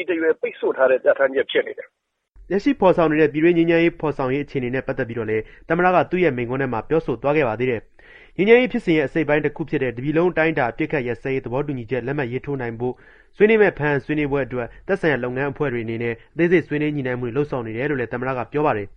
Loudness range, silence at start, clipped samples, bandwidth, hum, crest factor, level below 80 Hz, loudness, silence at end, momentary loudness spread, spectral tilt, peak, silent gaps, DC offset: 3 LU; 0 s; under 0.1%; 6.6 kHz; none; 20 dB; -46 dBFS; -21 LUFS; 0.05 s; 9 LU; -8.5 dB/octave; 0 dBFS; none; under 0.1%